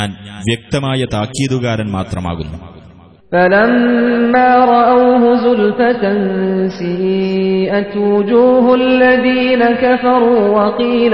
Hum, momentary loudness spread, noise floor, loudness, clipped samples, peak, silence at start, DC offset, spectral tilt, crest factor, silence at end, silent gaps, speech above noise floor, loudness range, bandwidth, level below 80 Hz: none; 10 LU; -40 dBFS; -12 LUFS; under 0.1%; 0 dBFS; 0 s; 0.4%; -6.5 dB/octave; 12 dB; 0 s; none; 28 dB; 5 LU; 10.5 kHz; -42 dBFS